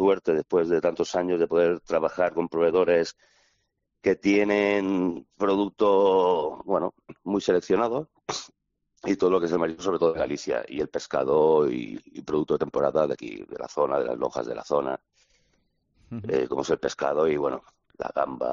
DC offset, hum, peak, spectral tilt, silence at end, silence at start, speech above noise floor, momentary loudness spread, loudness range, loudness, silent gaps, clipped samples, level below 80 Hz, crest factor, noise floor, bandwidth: under 0.1%; none; -10 dBFS; -4.5 dB/octave; 0 s; 0 s; 50 dB; 12 LU; 5 LU; -25 LUFS; none; under 0.1%; -60 dBFS; 16 dB; -75 dBFS; 7.4 kHz